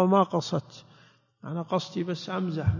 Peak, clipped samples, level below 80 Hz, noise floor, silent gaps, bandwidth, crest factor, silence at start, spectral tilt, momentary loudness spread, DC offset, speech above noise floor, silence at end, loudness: -10 dBFS; under 0.1%; -48 dBFS; -59 dBFS; none; 7.4 kHz; 18 dB; 0 s; -7 dB/octave; 22 LU; under 0.1%; 32 dB; 0 s; -29 LUFS